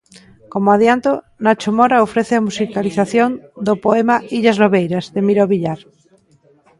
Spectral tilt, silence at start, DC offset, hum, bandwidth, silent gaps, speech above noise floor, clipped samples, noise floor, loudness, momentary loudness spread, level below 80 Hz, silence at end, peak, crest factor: -6.5 dB/octave; 0.55 s; under 0.1%; none; 11.5 kHz; none; 38 dB; under 0.1%; -53 dBFS; -15 LUFS; 7 LU; -56 dBFS; 1.05 s; 0 dBFS; 16 dB